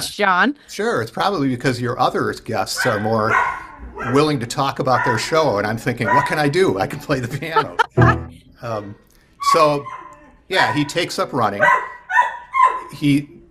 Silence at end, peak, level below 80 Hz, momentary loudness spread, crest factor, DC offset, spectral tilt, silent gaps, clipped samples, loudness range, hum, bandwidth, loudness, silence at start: 0.15 s; 0 dBFS; -44 dBFS; 9 LU; 18 dB; under 0.1%; -5 dB/octave; none; under 0.1%; 2 LU; none; 15.5 kHz; -18 LUFS; 0 s